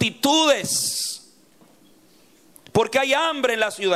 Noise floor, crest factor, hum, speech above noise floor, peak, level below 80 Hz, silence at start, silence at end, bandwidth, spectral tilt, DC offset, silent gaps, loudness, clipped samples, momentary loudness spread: -55 dBFS; 16 dB; none; 35 dB; -6 dBFS; -62 dBFS; 0 s; 0 s; 16 kHz; -2.5 dB/octave; under 0.1%; none; -20 LUFS; under 0.1%; 8 LU